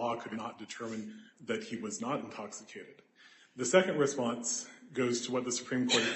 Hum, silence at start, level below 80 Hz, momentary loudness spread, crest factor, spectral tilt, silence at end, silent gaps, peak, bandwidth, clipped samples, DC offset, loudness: none; 0 s; -78 dBFS; 17 LU; 24 dB; -3 dB/octave; 0 s; none; -10 dBFS; 8.6 kHz; under 0.1%; under 0.1%; -34 LUFS